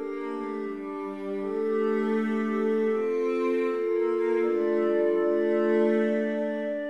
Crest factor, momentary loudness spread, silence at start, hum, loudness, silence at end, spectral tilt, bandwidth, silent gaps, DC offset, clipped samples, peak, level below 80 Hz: 14 dB; 9 LU; 0 s; none; -27 LUFS; 0 s; -7.5 dB/octave; 8 kHz; none; 0.2%; under 0.1%; -12 dBFS; -76 dBFS